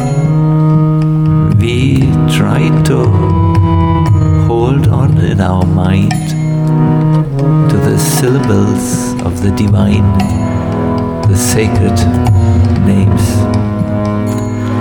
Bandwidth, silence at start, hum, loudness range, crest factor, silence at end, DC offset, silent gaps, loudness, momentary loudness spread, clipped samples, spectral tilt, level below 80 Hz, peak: 18.5 kHz; 0 s; none; 2 LU; 10 dB; 0 s; 0.2%; none; -11 LUFS; 4 LU; under 0.1%; -7 dB/octave; -26 dBFS; 0 dBFS